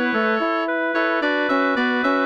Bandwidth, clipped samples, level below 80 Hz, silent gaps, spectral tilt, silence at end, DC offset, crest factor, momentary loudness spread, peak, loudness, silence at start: 7.6 kHz; under 0.1%; -64 dBFS; none; -5 dB/octave; 0 s; under 0.1%; 12 dB; 2 LU; -8 dBFS; -20 LUFS; 0 s